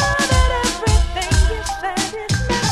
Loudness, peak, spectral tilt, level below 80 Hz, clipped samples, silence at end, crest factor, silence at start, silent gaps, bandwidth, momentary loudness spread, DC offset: -18 LUFS; -2 dBFS; -4 dB/octave; -20 dBFS; under 0.1%; 0 s; 14 dB; 0 s; none; 14 kHz; 6 LU; under 0.1%